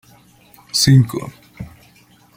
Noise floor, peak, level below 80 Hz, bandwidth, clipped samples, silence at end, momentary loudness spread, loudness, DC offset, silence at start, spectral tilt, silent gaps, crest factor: -50 dBFS; -2 dBFS; -46 dBFS; 16.5 kHz; under 0.1%; 0.7 s; 24 LU; -15 LUFS; under 0.1%; 0.75 s; -4.5 dB/octave; none; 18 dB